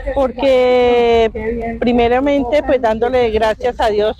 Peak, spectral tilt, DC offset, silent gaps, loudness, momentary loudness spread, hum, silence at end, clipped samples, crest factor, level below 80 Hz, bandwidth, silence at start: -4 dBFS; -6 dB/octave; under 0.1%; none; -14 LUFS; 6 LU; none; 0.05 s; under 0.1%; 10 dB; -32 dBFS; 9.4 kHz; 0 s